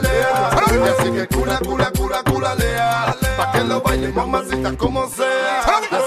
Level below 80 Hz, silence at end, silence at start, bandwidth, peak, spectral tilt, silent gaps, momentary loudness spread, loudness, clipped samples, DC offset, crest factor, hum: -28 dBFS; 0 s; 0 s; 15 kHz; -2 dBFS; -5 dB/octave; none; 5 LU; -18 LUFS; under 0.1%; under 0.1%; 16 dB; none